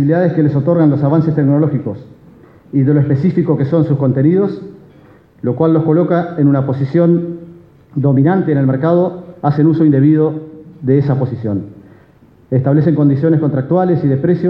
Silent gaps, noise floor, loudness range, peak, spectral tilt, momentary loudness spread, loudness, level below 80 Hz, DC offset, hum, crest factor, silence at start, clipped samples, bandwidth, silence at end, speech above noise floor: none; -46 dBFS; 2 LU; 0 dBFS; -12 dB/octave; 10 LU; -13 LUFS; -52 dBFS; under 0.1%; none; 12 dB; 0 s; under 0.1%; 5.2 kHz; 0 s; 34 dB